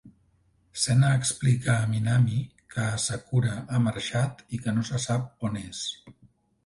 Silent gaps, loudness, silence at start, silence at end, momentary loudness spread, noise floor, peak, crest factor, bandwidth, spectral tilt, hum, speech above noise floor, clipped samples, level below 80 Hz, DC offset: none; -27 LUFS; 0.05 s; 0.55 s; 10 LU; -65 dBFS; -10 dBFS; 16 dB; 11.5 kHz; -5 dB/octave; none; 40 dB; under 0.1%; -54 dBFS; under 0.1%